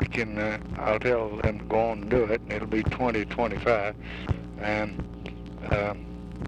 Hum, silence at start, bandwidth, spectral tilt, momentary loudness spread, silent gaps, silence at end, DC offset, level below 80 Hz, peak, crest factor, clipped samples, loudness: none; 0 s; 10 kHz; -7.5 dB/octave; 12 LU; none; 0 s; under 0.1%; -40 dBFS; -10 dBFS; 18 dB; under 0.1%; -28 LUFS